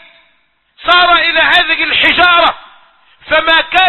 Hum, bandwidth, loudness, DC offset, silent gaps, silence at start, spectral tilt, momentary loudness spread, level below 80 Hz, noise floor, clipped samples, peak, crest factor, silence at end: none; 12 kHz; -8 LUFS; under 0.1%; none; 0.8 s; -3 dB/octave; 7 LU; -42 dBFS; -56 dBFS; 0.1%; 0 dBFS; 12 dB; 0 s